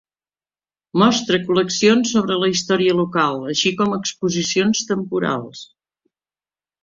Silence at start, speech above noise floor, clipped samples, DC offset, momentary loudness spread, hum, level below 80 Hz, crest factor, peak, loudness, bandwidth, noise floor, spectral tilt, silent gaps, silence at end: 0.95 s; over 72 dB; under 0.1%; under 0.1%; 7 LU; none; -60 dBFS; 18 dB; -2 dBFS; -18 LUFS; 7.6 kHz; under -90 dBFS; -4 dB/octave; none; 1.2 s